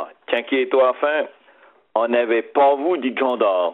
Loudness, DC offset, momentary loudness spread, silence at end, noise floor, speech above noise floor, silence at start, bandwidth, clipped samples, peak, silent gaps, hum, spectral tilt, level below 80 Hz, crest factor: -19 LUFS; under 0.1%; 8 LU; 0 s; -53 dBFS; 34 dB; 0 s; 4.1 kHz; under 0.1%; -4 dBFS; none; none; -1 dB/octave; -76 dBFS; 16 dB